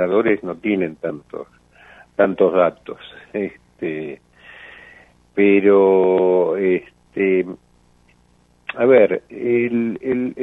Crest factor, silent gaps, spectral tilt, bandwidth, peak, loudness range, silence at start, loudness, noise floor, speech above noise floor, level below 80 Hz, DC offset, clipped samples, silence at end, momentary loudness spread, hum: 18 dB; none; -9 dB/octave; 3.9 kHz; -2 dBFS; 5 LU; 0 s; -18 LUFS; -56 dBFS; 39 dB; -60 dBFS; under 0.1%; under 0.1%; 0 s; 21 LU; 60 Hz at -55 dBFS